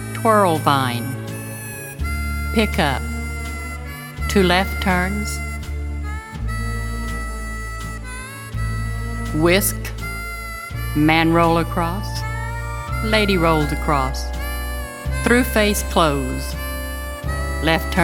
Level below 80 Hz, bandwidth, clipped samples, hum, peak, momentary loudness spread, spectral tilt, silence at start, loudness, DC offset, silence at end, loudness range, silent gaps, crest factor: -28 dBFS; 18.5 kHz; under 0.1%; none; 0 dBFS; 13 LU; -5 dB/octave; 0 s; -21 LUFS; under 0.1%; 0 s; 6 LU; none; 20 dB